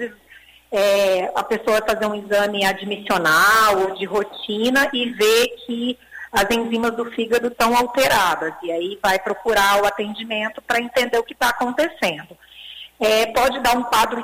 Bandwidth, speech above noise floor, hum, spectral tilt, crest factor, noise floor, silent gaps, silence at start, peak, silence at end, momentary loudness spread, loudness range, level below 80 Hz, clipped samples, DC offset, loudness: 16 kHz; 20 dB; none; -2.5 dB/octave; 14 dB; -40 dBFS; none; 0 s; -6 dBFS; 0 s; 9 LU; 3 LU; -50 dBFS; under 0.1%; under 0.1%; -19 LUFS